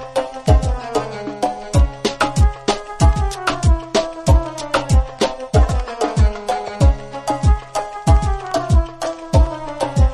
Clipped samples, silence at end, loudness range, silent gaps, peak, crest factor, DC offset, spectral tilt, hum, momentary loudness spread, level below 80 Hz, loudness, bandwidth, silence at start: under 0.1%; 0 s; 1 LU; none; 0 dBFS; 16 dB; under 0.1%; -6 dB/octave; none; 7 LU; -20 dBFS; -19 LUFS; 11.5 kHz; 0 s